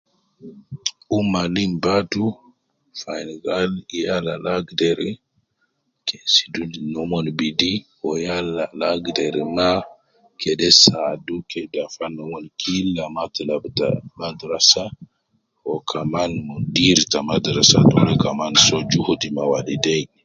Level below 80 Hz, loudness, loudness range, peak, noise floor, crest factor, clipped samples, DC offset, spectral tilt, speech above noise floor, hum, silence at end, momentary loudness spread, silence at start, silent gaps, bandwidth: -50 dBFS; -19 LUFS; 8 LU; 0 dBFS; -70 dBFS; 20 dB; under 0.1%; under 0.1%; -3.5 dB/octave; 50 dB; none; 0.2 s; 15 LU; 0.4 s; none; 10.5 kHz